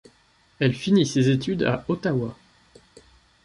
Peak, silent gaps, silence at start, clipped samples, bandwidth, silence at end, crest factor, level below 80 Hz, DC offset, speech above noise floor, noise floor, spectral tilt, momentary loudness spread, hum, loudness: -6 dBFS; none; 0.6 s; under 0.1%; 11.5 kHz; 1.1 s; 18 dB; -56 dBFS; under 0.1%; 38 dB; -60 dBFS; -6.5 dB/octave; 6 LU; none; -23 LUFS